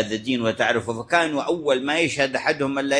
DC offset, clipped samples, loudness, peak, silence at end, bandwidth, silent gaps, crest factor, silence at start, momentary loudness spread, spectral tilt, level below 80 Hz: under 0.1%; under 0.1%; -22 LUFS; -4 dBFS; 0 s; 10.5 kHz; none; 18 dB; 0 s; 3 LU; -4 dB/octave; -60 dBFS